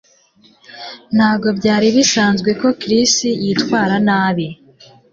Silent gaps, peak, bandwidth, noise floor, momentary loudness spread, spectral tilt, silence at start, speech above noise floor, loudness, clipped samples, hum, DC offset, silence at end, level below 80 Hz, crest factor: none; -2 dBFS; 7.8 kHz; -51 dBFS; 11 LU; -4 dB/octave; 0.7 s; 37 dB; -14 LUFS; under 0.1%; none; under 0.1%; 0.6 s; -54 dBFS; 14 dB